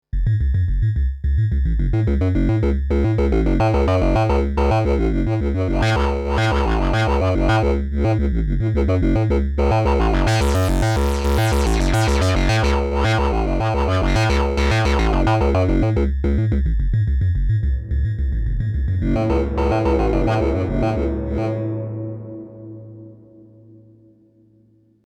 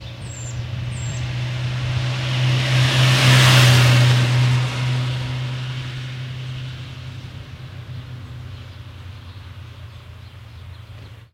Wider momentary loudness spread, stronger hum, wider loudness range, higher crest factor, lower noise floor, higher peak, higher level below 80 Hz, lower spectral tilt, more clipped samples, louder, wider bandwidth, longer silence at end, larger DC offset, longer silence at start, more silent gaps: second, 5 LU vs 26 LU; neither; second, 4 LU vs 21 LU; second, 12 dB vs 18 dB; first, -55 dBFS vs -39 dBFS; second, -6 dBFS vs -2 dBFS; first, -22 dBFS vs -42 dBFS; first, -7 dB/octave vs -4.5 dB/octave; neither; about the same, -19 LUFS vs -18 LUFS; second, 13.5 kHz vs 16 kHz; first, 1.9 s vs 0.1 s; neither; first, 0.15 s vs 0 s; neither